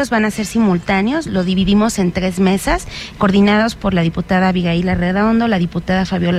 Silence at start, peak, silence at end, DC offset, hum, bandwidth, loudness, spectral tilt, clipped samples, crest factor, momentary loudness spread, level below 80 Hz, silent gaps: 0 s; -2 dBFS; 0 s; under 0.1%; none; 14 kHz; -15 LUFS; -6 dB/octave; under 0.1%; 12 dB; 5 LU; -32 dBFS; none